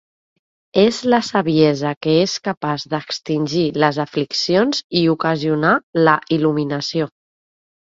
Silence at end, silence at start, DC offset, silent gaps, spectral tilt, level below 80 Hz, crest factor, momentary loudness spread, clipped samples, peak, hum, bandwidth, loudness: 0.85 s; 0.75 s; under 0.1%; 1.97-2.01 s, 2.57-2.61 s, 4.84-4.90 s, 5.83-5.93 s; -5.5 dB/octave; -58 dBFS; 18 dB; 7 LU; under 0.1%; 0 dBFS; none; 7.8 kHz; -18 LUFS